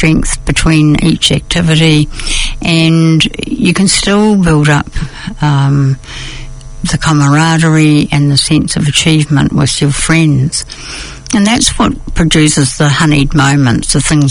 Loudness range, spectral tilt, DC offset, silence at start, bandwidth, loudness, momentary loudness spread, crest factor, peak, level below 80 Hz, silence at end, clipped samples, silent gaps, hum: 2 LU; -4.5 dB/octave; under 0.1%; 0 s; 11 kHz; -9 LUFS; 9 LU; 10 dB; 0 dBFS; -24 dBFS; 0 s; 0.3%; none; none